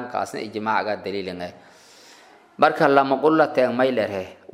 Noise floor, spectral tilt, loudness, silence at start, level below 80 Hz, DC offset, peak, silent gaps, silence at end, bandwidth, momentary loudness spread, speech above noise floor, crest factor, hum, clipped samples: -50 dBFS; -6 dB/octave; -21 LUFS; 0 s; -70 dBFS; under 0.1%; -2 dBFS; none; 0.2 s; 15 kHz; 14 LU; 29 dB; 22 dB; none; under 0.1%